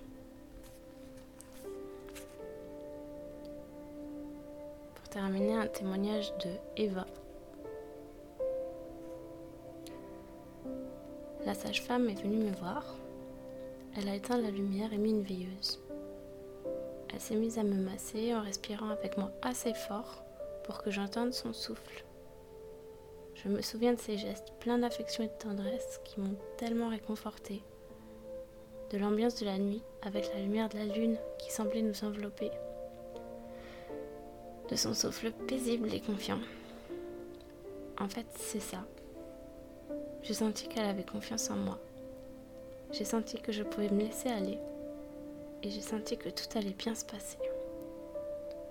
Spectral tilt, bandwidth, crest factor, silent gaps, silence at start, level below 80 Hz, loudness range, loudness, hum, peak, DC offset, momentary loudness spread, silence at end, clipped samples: -4.5 dB/octave; 18 kHz; 20 dB; none; 0 s; -60 dBFS; 7 LU; -38 LUFS; none; -18 dBFS; under 0.1%; 17 LU; 0 s; under 0.1%